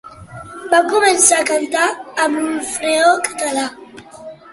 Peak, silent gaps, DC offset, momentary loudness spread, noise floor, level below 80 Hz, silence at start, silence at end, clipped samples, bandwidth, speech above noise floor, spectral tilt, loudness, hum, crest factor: 0 dBFS; none; under 0.1%; 24 LU; -36 dBFS; -56 dBFS; 0.05 s; 0 s; under 0.1%; 12 kHz; 21 dB; -1 dB/octave; -15 LUFS; none; 18 dB